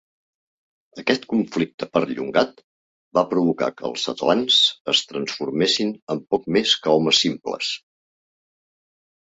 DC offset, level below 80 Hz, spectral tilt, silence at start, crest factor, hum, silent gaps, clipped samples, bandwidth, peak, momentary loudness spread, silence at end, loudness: under 0.1%; -64 dBFS; -3.5 dB/octave; 0.95 s; 20 dB; none; 1.74-1.78 s, 2.64-3.11 s, 4.81-4.85 s, 6.02-6.07 s; under 0.1%; 8.2 kHz; -2 dBFS; 10 LU; 1.5 s; -21 LUFS